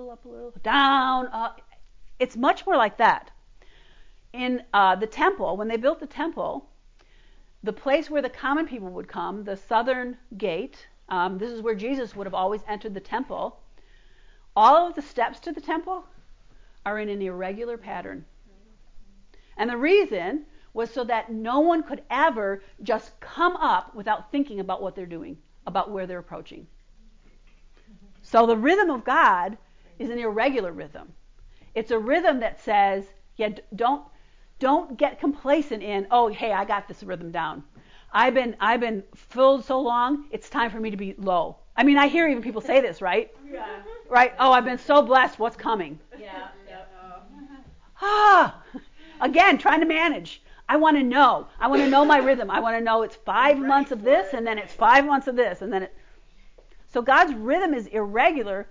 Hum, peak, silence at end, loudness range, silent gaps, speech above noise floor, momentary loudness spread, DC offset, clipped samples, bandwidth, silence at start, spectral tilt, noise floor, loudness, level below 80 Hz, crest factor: none; -6 dBFS; 0 s; 9 LU; none; 30 dB; 17 LU; under 0.1%; under 0.1%; 7.6 kHz; 0 s; -5 dB/octave; -53 dBFS; -23 LUFS; -54 dBFS; 18 dB